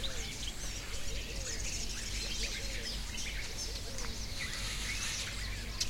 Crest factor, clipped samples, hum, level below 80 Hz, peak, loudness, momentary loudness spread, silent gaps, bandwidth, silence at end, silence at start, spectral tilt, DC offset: 20 dB; under 0.1%; none; -42 dBFS; -18 dBFS; -38 LUFS; 4 LU; none; 16.5 kHz; 0 s; 0 s; -2 dB/octave; under 0.1%